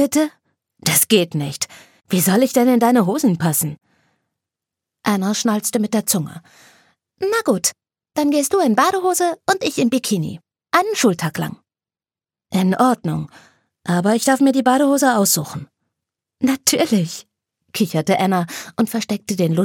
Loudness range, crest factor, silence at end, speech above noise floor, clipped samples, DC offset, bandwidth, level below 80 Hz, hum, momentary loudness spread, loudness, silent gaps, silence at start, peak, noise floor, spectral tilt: 4 LU; 18 dB; 0 s; over 73 dB; under 0.1%; under 0.1%; 17.5 kHz; -64 dBFS; none; 12 LU; -18 LUFS; none; 0 s; 0 dBFS; under -90 dBFS; -4.5 dB/octave